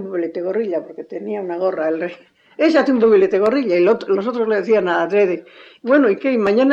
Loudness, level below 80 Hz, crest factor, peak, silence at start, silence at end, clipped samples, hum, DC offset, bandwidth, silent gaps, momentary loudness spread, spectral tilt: -17 LUFS; -64 dBFS; 12 dB; -4 dBFS; 0 s; 0 s; under 0.1%; none; under 0.1%; 7.6 kHz; none; 12 LU; -7 dB/octave